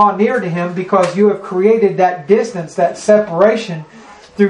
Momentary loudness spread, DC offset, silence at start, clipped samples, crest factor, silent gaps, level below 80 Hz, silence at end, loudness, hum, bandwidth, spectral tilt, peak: 9 LU; under 0.1%; 0 s; under 0.1%; 14 dB; none; -58 dBFS; 0 s; -14 LUFS; none; 10.5 kHz; -6.5 dB/octave; 0 dBFS